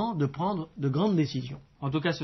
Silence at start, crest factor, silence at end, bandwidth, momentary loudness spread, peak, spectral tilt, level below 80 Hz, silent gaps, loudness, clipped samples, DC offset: 0 s; 14 dB; 0 s; 6.2 kHz; 10 LU; -14 dBFS; -6 dB/octave; -60 dBFS; none; -29 LUFS; under 0.1%; under 0.1%